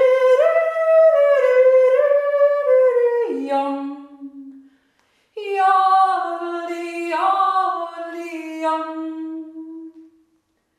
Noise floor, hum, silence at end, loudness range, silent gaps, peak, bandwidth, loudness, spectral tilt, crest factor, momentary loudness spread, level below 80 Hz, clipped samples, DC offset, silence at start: -66 dBFS; none; 0.8 s; 8 LU; none; -6 dBFS; 10.5 kHz; -17 LUFS; -3 dB/octave; 14 dB; 19 LU; -76 dBFS; under 0.1%; under 0.1%; 0 s